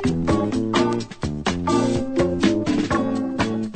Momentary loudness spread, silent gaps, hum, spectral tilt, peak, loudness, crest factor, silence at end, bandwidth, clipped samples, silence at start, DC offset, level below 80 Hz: 5 LU; none; none; -6 dB/octave; -6 dBFS; -22 LUFS; 16 dB; 0 s; 9.2 kHz; under 0.1%; 0 s; under 0.1%; -40 dBFS